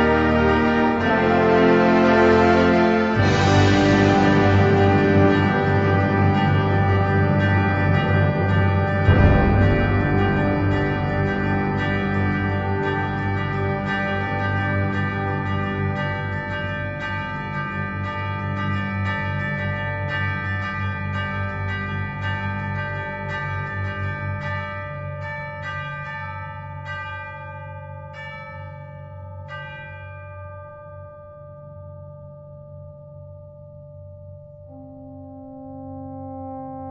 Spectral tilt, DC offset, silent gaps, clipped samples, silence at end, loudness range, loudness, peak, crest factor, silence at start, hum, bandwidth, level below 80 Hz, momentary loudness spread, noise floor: -7.5 dB/octave; under 0.1%; none; under 0.1%; 0 s; 22 LU; -20 LUFS; -2 dBFS; 18 dB; 0 s; none; 7.6 kHz; -38 dBFS; 23 LU; -41 dBFS